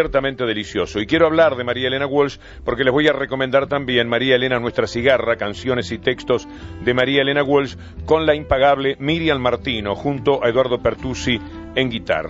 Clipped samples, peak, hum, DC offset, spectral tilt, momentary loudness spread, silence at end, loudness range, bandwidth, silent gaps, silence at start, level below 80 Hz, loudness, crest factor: under 0.1%; -2 dBFS; none; under 0.1%; -5.5 dB/octave; 7 LU; 0 s; 1 LU; 8 kHz; none; 0 s; -40 dBFS; -19 LUFS; 16 dB